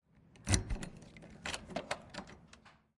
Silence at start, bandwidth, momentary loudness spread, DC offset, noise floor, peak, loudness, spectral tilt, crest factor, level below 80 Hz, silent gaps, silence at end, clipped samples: 0.15 s; 11.5 kHz; 22 LU; under 0.1%; -62 dBFS; -12 dBFS; -40 LUFS; -3.5 dB/octave; 30 dB; -48 dBFS; none; 0.3 s; under 0.1%